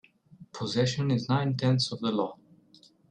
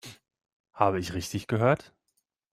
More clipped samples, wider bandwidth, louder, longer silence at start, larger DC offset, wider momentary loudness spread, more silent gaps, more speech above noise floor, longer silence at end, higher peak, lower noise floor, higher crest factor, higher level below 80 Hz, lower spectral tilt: neither; second, 10 kHz vs 15.5 kHz; about the same, -28 LUFS vs -28 LUFS; first, 0.4 s vs 0.05 s; neither; about the same, 9 LU vs 8 LU; second, none vs 0.53-0.64 s; second, 32 dB vs 51 dB; about the same, 0.75 s vs 0.7 s; second, -14 dBFS vs -6 dBFS; second, -59 dBFS vs -78 dBFS; second, 16 dB vs 24 dB; second, -66 dBFS vs -60 dBFS; about the same, -6 dB/octave vs -6 dB/octave